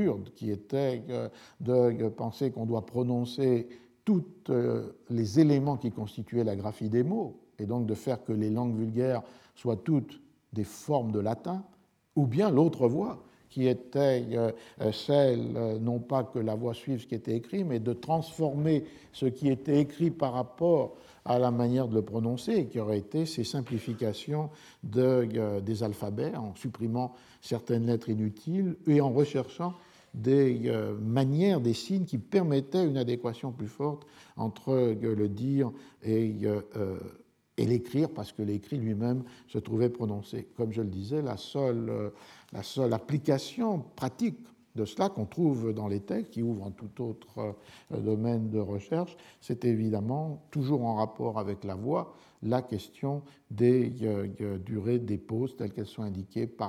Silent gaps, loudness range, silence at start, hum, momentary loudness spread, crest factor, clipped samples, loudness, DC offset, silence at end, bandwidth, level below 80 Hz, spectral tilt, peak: none; 4 LU; 0 s; none; 12 LU; 20 dB; under 0.1%; -31 LUFS; under 0.1%; 0 s; 14.5 kHz; -68 dBFS; -8 dB/octave; -10 dBFS